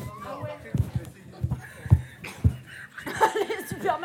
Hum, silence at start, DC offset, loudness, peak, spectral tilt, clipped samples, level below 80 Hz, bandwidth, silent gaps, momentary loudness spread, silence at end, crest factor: none; 0 s; under 0.1%; -28 LUFS; -4 dBFS; -6.5 dB/octave; under 0.1%; -40 dBFS; 16.5 kHz; none; 14 LU; 0 s; 24 dB